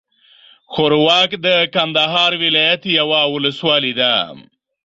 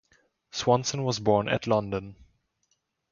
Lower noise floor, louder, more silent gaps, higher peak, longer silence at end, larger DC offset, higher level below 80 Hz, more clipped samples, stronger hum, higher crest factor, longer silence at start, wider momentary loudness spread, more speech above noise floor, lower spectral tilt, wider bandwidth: second, -48 dBFS vs -75 dBFS; first, -14 LUFS vs -27 LUFS; neither; first, -2 dBFS vs -8 dBFS; second, 0.45 s vs 1 s; neither; about the same, -60 dBFS vs -58 dBFS; neither; neither; second, 14 dB vs 20 dB; first, 0.7 s vs 0.55 s; second, 5 LU vs 11 LU; second, 33 dB vs 49 dB; about the same, -4.5 dB/octave vs -5 dB/octave; about the same, 7.8 kHz vs 7.4 kHz